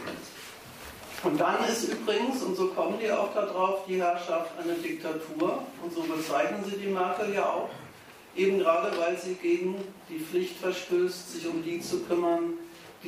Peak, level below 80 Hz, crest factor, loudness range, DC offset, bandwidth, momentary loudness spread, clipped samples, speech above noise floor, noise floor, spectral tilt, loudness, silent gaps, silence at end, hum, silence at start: -12 dBFS; -68 dBFS; 18 dB; 2 LU; under 0.1%; 15.5 kHz; 14 LU; under 0.1%; 21 dB; -50 dBFS; -4.5 dB/octave; -30 LUFS; none; 0 s; none; 0 s